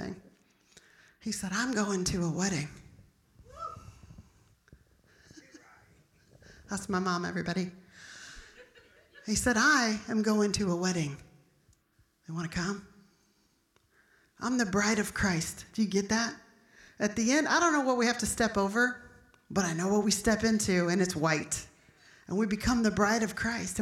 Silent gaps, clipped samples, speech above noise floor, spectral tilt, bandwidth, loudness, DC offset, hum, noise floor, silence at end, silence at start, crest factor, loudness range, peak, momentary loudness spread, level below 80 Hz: none; under 0.1%; 41 dB; -4 dB/octave; 15.5 kHz; -29 LUFS; under 0.1%; none; -70 dBFS; 0 s; 0 s; 18 dB; 12 LU; -14 dBFS; 17 LU; -54 dBFS